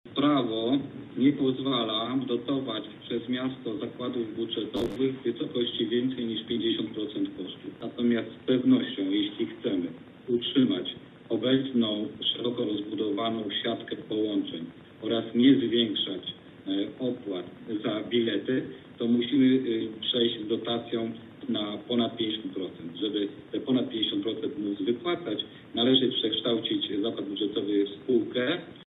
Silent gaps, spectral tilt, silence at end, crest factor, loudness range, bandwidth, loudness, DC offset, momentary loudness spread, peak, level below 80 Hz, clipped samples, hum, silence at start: none; -7.5 dB/octave; 0.05 s; 18 dB; 3 LU; 4.2 kHz; -28 LUFS; under 0.1%; 11 LU; -10 dBFS; -68 dBFS; under 0.1%; none; 0.05 s